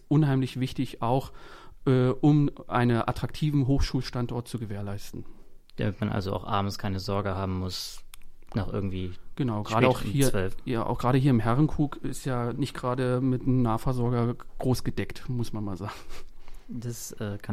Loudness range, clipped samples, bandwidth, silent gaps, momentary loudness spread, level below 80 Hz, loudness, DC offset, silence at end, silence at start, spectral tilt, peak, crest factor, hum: 6 LU; under 0.1%; 15.5 kHz; none; 13 LU; -40 dBFS; -28 LUFS; under 0.1%; 0 s; 0.05 s; -7 dB/octave; -6 dBFS; 22 dB; none